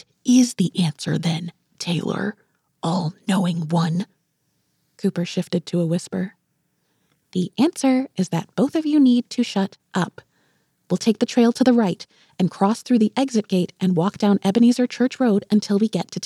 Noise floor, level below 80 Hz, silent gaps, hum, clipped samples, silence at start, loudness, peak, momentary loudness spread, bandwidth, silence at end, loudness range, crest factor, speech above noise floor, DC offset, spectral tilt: -70 dBFS; -72 dBFS; none; none; under 0.1%; 0.25 s; -21 LUFS; -4 dBFS; 10 LU; 12.5 kHz; 0 s; 6 LU; 16 dB; 50 dB; under 0.1%; -6 dB/octave